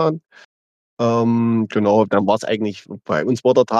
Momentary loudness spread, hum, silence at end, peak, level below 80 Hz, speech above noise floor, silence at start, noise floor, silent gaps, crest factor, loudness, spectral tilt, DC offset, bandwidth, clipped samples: 8 LU; none; 0 s; -2 dBFS; -64 dBFS; over 73 dB; 0 s; under -90 dBFS; 0.45-0.97 s; 16 dB; -18 LUFS; -7 dB/octave; under 0.1%; 9.2 kHz; under 0.1%